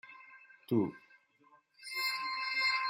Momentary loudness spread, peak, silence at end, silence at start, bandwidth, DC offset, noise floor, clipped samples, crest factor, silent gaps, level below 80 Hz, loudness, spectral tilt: 23 LU; -18 dBFS; 0 s; 0.05 s; 16 kHz; under 0.1%; -67 dBFS; under 0.1%; 18 dB; none; -82 dBFS; -34 LUFS; -4 dB/octave